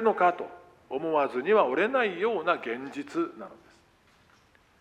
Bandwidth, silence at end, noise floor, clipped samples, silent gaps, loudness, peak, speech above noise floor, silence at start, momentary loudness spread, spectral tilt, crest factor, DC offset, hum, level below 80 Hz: 9.4 kHz; 1.25 s; -62 dBFS; under 0.1%; none; -27 LUFS; -8 dBFS; 35 dB; 0 s; 15 LU; -6 dB/octave; 20 dB; under 0.1%; none; -74 dBFS